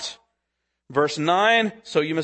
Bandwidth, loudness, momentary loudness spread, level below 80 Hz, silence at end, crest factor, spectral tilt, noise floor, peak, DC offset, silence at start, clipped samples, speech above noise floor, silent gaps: 8.8 kHz; -21 LUFS; 9 LU; -68 dBFS; 0 s; 18 dB; -4 dB/octave; -79 dBFS; -6 dBFS; under 0.1%; 0 s; under 0.1%; 58 dB; none